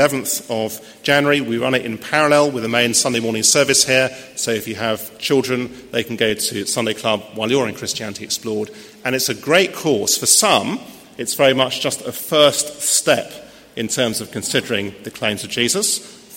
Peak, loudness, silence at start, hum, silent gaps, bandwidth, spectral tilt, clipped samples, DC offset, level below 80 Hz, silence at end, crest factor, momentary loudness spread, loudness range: 0 dBFS; -17 LUFS; 0 s; none; none; 16.5 kHz; -2.5 dB/octave; under 0.1%; under 0.1%; -58 dBFS; 0 s; 18 dB; 11 LU; 5 LU